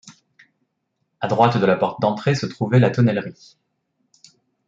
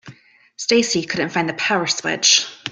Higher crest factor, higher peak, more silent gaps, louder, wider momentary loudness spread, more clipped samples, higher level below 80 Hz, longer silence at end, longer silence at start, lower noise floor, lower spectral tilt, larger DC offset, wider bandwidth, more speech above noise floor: about the same, 20 dB vs 20 dB; about the same, -2 dBFS vs 0 dBFS; neither; about the same, -19 LUFS vs -17 LUFS; about the same, 10 LU vs 8 LU; neither; about the same, -64 dBFS vs -62 dBFS; first, 1.35 s vs 0 s; about the same, 0.05 s vs 0.05 s; first, -74 dBFS vs -47 dBFS; first, -7.5 dB/octave vs -2 dB/octave; neither; second, 7.6 kHz vs 12 kHz; first, 55 dB vs 28 dB